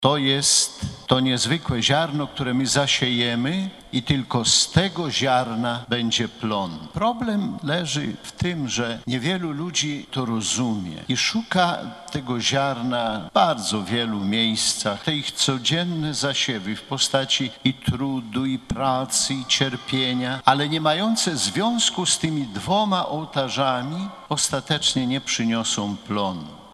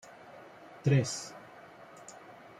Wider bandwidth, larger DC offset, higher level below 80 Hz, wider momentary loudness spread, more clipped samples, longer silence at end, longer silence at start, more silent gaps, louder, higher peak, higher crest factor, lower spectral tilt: about the same, 13 kHz vs 12 kHz; neither; first, -50 dBFS vs -72 dBFS; second, 7 LU vs 23 LU; neither; second, 0.05 s vs 0.3 s; second, 0 s vs 0.3 s; neither; first, -22 LUFS vs -31 LUFS; first, 0 dBFS vs -16 dBFS; about the same, 22 dB vs 20 dB; second, -3.5 dB/octave vs -5.5 dB/octave